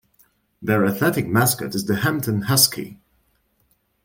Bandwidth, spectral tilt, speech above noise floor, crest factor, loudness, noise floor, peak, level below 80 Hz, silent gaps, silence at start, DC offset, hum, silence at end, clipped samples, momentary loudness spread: 17 kHz; -4 dB/octave; 45 dB; 22 dB; -19 LUFS; -65 dBFS; 0 dBFS; -56 dBFS; none; 0.6 s; under 0.1%; none; 1.1 s; under 0.1%; 12 LU